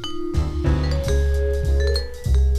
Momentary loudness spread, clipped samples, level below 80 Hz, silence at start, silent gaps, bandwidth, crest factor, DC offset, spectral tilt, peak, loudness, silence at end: 4 LU; under 0.1%; -20 dBFS; 0 s; none; 12.5 kHz; 12 dB; under 0.1%; -6.5 dB/octave; -8 dBFS; -22 LUFS; 0 s